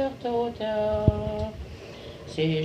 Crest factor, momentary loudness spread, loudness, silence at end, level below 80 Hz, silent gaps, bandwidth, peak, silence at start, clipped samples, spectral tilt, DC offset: 22 dB; 17 LU; -28 LUFS; 0 s; -40 dBFS; none; 9.8 kHz; -6 dBFS; 0 s; under 0.1%; -7.5 dB/octave; under 0.1%